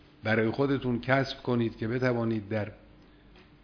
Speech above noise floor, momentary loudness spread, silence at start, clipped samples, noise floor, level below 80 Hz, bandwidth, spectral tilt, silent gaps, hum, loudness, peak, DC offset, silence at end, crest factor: 27 dB; 6 LU; 0.25 s; under 0.1%; -55 dBFS; -56 dBFS; 5.4 kHz; -8 dB/octave; none; none; -29 LUFS; -10 dBFS; under 0.1%; 0.25 s; 20 dB